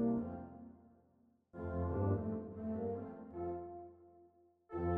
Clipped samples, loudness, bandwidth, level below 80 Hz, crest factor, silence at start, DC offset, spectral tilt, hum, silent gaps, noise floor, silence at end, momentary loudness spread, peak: under 0.1%; -42 LUFS; 3.2 kHz; -58 dBFS; 18 dB; 0 s; under 0.1%; -11.5 dB/octave; none; none; -73 dBFS; 0 s; 19 LU; -24 dBFS